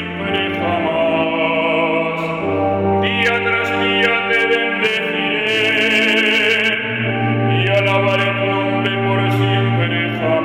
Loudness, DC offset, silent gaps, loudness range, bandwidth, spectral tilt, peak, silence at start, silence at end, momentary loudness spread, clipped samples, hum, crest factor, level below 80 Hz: -16 LUFS; under 0.1%; none; 2 LU; 13.5 kHz; -6 dB/octave; -2 dBFS; 0 s; 0 s; 5 LU; under 0.1%; none; 14 dB; -52 dBFS